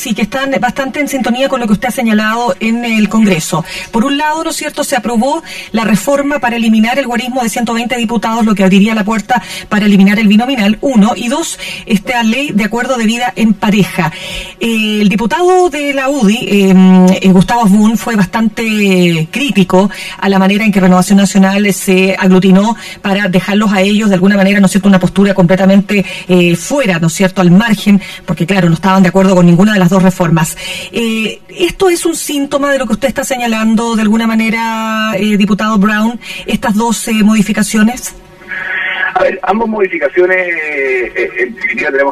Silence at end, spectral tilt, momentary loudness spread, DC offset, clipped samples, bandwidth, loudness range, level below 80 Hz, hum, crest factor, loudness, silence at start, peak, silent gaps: 0 s; -5.5 dB/octave; 8 LU; under 0.1%; under 0.1%; 14 kHz; 4 LU; -40 dBFS; none; 10 dB; -10 LUFS; 0 s; 0 dBFS; none